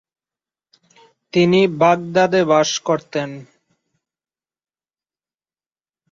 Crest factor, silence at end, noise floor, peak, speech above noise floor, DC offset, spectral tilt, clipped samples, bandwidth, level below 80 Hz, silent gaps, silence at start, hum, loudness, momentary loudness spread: 20 dB; 2.7 s; under -90 dBFS; -2 dBFS; over 74 dB; under 0.1%; -5 dB/octave; under 0.1%; 7.6 kHz; -62 dBFS; none; 1.35 s; none; -17 LUFS; 11 LU